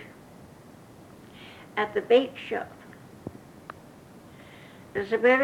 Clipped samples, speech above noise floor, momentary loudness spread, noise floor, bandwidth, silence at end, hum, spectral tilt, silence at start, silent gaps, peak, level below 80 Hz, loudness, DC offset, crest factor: under 0.1%; 25 dB; 27 LU; -50 dBFS; 13 kHz; 0 s; none; -5.5 dB/octave; 0 s; none; -8 dBFS; -66 dBFS; -26 LUFS; under 0.1%; 22 dB